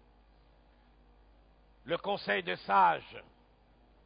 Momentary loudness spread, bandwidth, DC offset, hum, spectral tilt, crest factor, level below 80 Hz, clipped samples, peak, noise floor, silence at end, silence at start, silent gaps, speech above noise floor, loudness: 24 LU; 5 kHz; under 0.1%; none; -1.5 dB/octave; 22 dB; -64 dBFS; under 0.1%; -14 dBFS; -64 dBFS; 0.85 s; 1.85 s; none; 33 dB; -31 LUFS